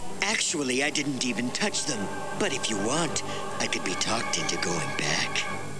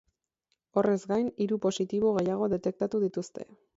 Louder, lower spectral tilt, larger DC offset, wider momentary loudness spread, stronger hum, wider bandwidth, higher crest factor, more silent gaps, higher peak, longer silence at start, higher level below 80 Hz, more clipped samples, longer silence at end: about the same, -27 LUFS vs -29 LUFS; second, -2.5 dB/octave vs -6.5 dB/octave; first, 2% vs under 0.1%; about the same, 5 LU vs 6 LU; neither; first, 11 kHz vs 8 kHz; about the same, 18 dB vs 18 dB; neither; about the same, -10 dBFS vs -12 dBFS; second, 0 s vs 0.75 s; about the same, -62 dBFS vs -66 dBFS; neither; second, 0 s vs 0.35 s